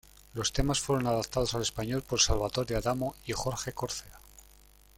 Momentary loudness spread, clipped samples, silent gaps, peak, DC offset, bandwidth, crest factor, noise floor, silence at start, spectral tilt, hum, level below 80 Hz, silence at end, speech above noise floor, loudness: 9 LU; under 0.1%; none; -10 dBFS; under 0.1%; 17 kHz; 22 dB; -58 dBFS; 0.35 s; -3.5 dB/octave; none; -42 dBFS; 0.6 s; 27 dB; -31 LUFS